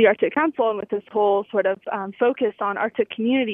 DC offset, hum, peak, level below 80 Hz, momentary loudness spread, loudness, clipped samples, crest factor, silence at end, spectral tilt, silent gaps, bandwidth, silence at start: under 0.1%; none; -4 dBFS; -70 dBFS; 6 LU; -22 LUFS; under 0.1%; 18 dB; 0 s; -9 dB/octave; none; 3.7 kHz; 0 s